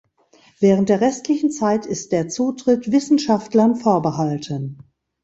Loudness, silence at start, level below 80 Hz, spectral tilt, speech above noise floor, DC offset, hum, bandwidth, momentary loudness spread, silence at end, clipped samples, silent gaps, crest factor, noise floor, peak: -19 LUFS; 0.6 s; -58 dBFS; -6 dB/octave; 36 dB; under 0.1%; none; 8.2 kHz; 7 LU; 0.5 s; under 0.1%; none; 16 dB; -55 dBFS; -2 dBFS